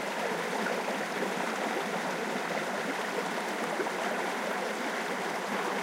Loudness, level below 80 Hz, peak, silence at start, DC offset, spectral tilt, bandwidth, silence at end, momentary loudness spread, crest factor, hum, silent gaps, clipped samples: -32 LUFS; under -90 dBFS; -18 dBFS; 0 s; under 0.1%; -3.5 dB/octave; 16 kHz; 0 s; 1 LU; 14 dB; none; none; under 0.1%